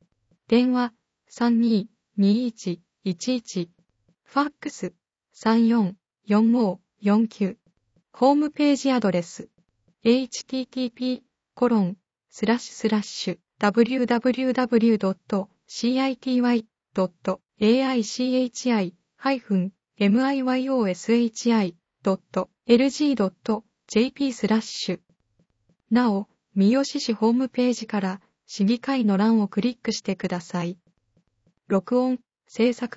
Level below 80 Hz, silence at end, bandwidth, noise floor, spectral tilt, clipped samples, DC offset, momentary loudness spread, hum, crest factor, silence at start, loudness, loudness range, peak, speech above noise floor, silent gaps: -66 dBFS; 0.1 s; 8 kHz; -68 dBFS; -6 dB/octave; under 0.1%; under 0.1%; 10 LU; none; 20 dB; 0.5 s; -24 LUFS; 3 LU; -4 dBFS; 46 dB; none